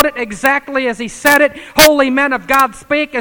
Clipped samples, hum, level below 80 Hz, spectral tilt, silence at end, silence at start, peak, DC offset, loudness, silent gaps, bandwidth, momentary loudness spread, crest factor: 0.4%; none; -42 dBFS; -2 dB/octave; 0 s; 0 s; 0 dBFS; under 0.1%; -12 LUFS; none; over 20 kHz; 9 LU; 14 dB